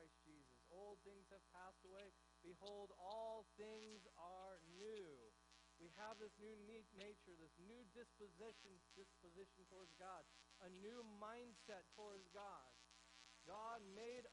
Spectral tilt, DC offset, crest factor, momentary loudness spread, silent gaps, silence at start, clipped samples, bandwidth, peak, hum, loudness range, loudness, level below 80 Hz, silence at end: -3.5 dB/octave; under 0.1%; 20 dB; 11 LU; none; 0 s; under 0.1%; 10.5 kHz; -42 dBFS; none; 5 LU; -61 LUFS; -82 dBFS; 0 s